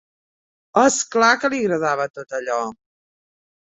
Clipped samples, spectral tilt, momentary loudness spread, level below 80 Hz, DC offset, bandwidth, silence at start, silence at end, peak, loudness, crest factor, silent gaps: under 0.1%; -3 dB/octave; 10 LU; -64 dBFS; under 0.1%; 8.4 kHz; 0.75 s; 1.05 s; -2 dBFS; -19 LUFS; 20 dB; 2.10-2.14 s